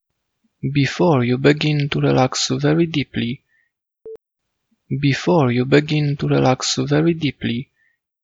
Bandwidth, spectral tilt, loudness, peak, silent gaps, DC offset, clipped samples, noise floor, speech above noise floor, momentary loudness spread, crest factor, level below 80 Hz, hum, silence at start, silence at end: 8 kHz; -5.5 dB/octave; -18 LUFS; 0 dBFS; none; under 0.1%; under 0.1%; -77 dBFS; 60 dB; 9 LU; 18 dB; -50 dBFS; none; 0.65 s; 0.6 s